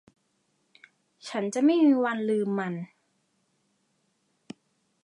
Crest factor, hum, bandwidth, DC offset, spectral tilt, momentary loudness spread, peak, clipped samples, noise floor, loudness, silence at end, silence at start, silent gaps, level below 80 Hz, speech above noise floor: 18 dB; none; 11 kHz; under 0.1%; -6 dB/octave; 18 LU; -12 dBFS; under 0.1%; -73 dBFS; -25 LUFS; 2.2 s; 1.25 s; none; -84 dBFS; 48 dB